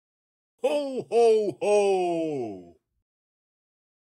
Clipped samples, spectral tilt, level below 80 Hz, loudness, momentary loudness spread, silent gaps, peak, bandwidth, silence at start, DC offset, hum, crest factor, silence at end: under 0.1%; -5 dB/octave; -80 dBFS; -25 LUFS; 12 LU; none; -12 dBFS; 11.5 kHz; 0.65 s; under 0.1%; none; 14 dB; 1.4 s